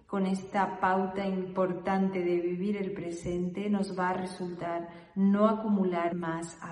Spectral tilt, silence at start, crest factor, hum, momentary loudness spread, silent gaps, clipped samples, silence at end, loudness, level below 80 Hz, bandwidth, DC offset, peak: -7.5 dB/octave; 0.1 s; 18 dB; none; 9 LU; none; under 0.1%; 0 s; -31 LUFS; -62 dBFS; 11 kHz; under 0.1%; -12 dBFS